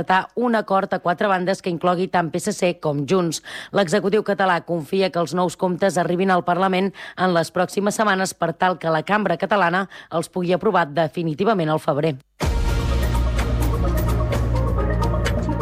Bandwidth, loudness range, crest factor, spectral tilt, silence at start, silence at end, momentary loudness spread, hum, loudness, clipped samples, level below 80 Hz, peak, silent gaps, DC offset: 16 kHz; 2 LU; 14 dB; -5.5 dB/octave; 0 s; 0 s; 5 LU; none; -21 LUFS; under 0.1%; -30 dBFS; -6 dBFS; none; under 0.1%